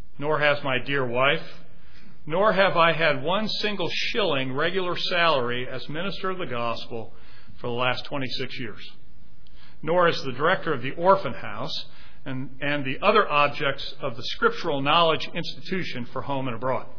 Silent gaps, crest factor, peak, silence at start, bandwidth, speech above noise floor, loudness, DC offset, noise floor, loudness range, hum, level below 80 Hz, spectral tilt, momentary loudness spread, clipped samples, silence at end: none; 20 dB; -6 dBFS; 0.2 s; 5.4 kHz; 27 dB; -25 LUFS; 4%; -52 dBFS; 7 LU; none; -54 dBFS; -5.5 dB/octave; 14 LU; under 0.1%; 0.05 s